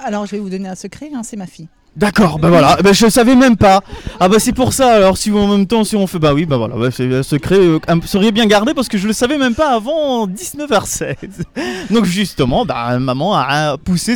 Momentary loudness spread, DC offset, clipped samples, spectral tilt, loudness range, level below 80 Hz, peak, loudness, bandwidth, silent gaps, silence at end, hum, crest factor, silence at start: 15 LU; under 0.1%; under 0.1%; -5 dB/octave; 6 LU; -36 dBFS; 0 dBFS; -13 LUFS; 19 kHz; none; 0 s; none; 12 dB; 0 s